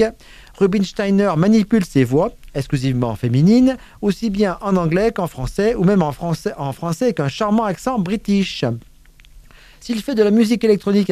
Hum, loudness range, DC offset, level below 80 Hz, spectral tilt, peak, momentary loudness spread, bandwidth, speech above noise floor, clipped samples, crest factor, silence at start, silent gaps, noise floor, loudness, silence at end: none; 4 LU; under 0.1%; -40 dBFS; -7 dB/octave; -2 dBFS; 9 LU; 14.5 kHz; 28 dB; under 0.1%; 16 dB; 0 s; none; -45 dBFS; -18 LUFS; 0 s